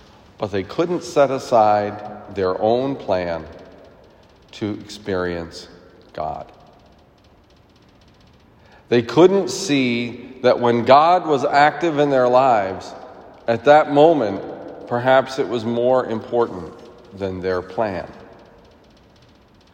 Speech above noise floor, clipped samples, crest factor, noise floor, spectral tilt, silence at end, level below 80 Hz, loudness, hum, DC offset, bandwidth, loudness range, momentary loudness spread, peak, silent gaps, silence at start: 34 dB; under 0.1%; 20 dB; -52 dBFS; -5.5 dB/octave; 1.5 s; -58 dBFS; -18 LUFS; none; under 0.1%; 15.5 kHz; 13 LU; 17 LU; 0 dBFS; none; 0.4 s